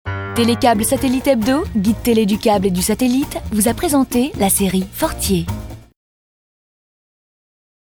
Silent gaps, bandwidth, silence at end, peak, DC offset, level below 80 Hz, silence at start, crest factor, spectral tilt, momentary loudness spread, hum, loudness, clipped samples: none; over 20 kHz; 2.2 s; 0 dBFS; under 0.1%; -36 dBFS; 0.05 s; 18 dB; -4.5 dB/octave; 6 LU; none; -16 LUFS; under 0.1%